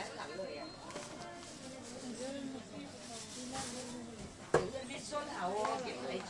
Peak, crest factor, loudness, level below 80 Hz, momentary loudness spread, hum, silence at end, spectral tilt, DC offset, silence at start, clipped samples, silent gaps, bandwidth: -16 dBFS; 26 dB; -42 LUFS; -66 dBFS; 12 LU; none; 0 s; -3.5 dB/octave; under 0.1%; 0 s; under 0.1%; none; 11.5 kHz